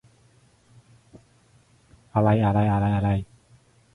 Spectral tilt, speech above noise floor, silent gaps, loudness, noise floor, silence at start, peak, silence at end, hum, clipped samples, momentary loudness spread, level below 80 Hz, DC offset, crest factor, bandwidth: -9.5 dB/octave; 38 dB; none; -23 LUFS; -59 dBFS; 1.15 s; -6 dBFS; 0.7 s; none; under 0.1%; 9 LU; -46 dBFS; under 0.1%; 20 dB; 4 kHz